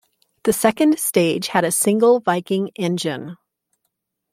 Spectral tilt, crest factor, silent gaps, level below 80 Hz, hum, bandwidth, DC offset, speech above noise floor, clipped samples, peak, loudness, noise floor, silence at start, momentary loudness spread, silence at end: -4 dB/octave; 18 dB; none; -62 dBFS; none; 16.5 kHz; under 0.1%; 57 dB; under 0.1%; -2 dBFS; -18 LUFS; -75 dBFS; 0.45 s; 9 LU; 1 s